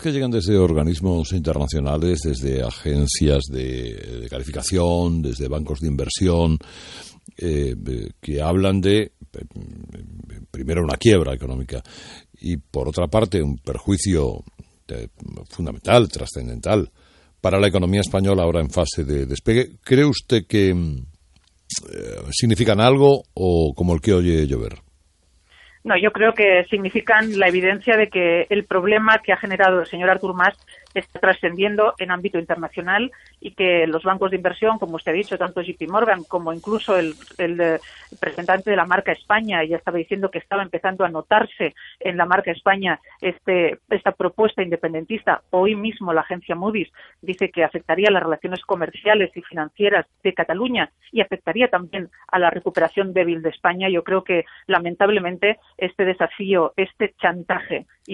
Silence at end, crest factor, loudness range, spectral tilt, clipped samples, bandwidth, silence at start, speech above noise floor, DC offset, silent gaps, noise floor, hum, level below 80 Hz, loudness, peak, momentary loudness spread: 0 s; 18 dB; 5 LU; -5.5 dB/octave; under 0.1%; 11.5 kHz; 0 s; 39 dB; under 0.1%; none; -59 dBFS; none; -38 dBFS; -20 LUFS; -2 dBFS; 13 LU